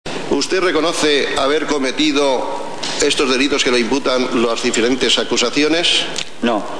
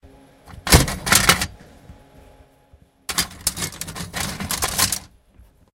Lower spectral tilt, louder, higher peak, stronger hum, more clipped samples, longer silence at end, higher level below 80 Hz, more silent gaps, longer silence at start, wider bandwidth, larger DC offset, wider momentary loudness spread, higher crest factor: about the same, -2.5 dB/octave vs -2.5 dB/octave; first, -16 LUFS vs -19 LUFS; about the same, -2 dBFS vs 0 dBFS; neither; neither; second, 0 s vs 0.75 s; second, -46 dBFS vs -32 dBFS; neither; about the same, 0.05 s vs 0.05 s; second, 11 kHz vs 17 kHz; first, 4% vs under 0.1%; second, 6 LU vs 14 LU; second, 14 dB vs 24 dB